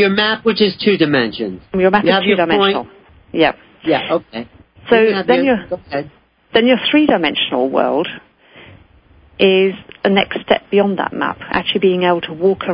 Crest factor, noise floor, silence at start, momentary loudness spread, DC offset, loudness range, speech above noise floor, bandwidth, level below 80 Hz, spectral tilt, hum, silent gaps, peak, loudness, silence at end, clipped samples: 16 dB; -48 dBFS; 0 s; 11 LU; under 0.1%; 2 LU; 33 dB; 5.4 kHz; -50 dBFS; -10 dB/octave; none; none; 0 dBFS; -15 LUFS; 0 s; under 0.1%